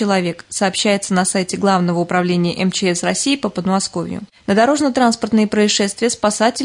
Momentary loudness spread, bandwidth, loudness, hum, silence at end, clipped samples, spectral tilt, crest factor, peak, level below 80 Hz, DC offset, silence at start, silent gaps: 4 LU; 11 kHz; -16 LUFS; none; 0 s; under 0.1%; -4 dB/octave; 14 dB; -2 dBFS; -56 dBFS; under 0.1%; 0 s; none